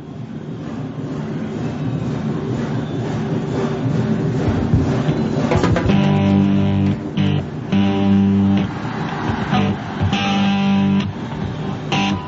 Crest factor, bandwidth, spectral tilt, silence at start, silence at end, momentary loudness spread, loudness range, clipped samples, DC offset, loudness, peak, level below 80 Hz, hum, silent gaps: 16 dB; 7.8 kHz; -7.5 dB/octave; 0 s; 0 s; 10 LU; 6 LU; under 0.1%; under 0.1%; -19 LUFS; -2 dBFS; -38 dBFS; none; none